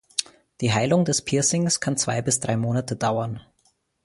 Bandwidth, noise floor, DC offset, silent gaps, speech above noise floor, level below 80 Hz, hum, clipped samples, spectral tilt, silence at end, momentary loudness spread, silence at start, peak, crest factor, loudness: 11.5 kHz; -67 dBFS; under 0.1%; none; 44 dB; -56 dBFS; none; under 0.1%; -4 dB/octave; 0.65 s; 8 LU; 0.2 s; -4 dBFS; 20 dB; -23 LUFS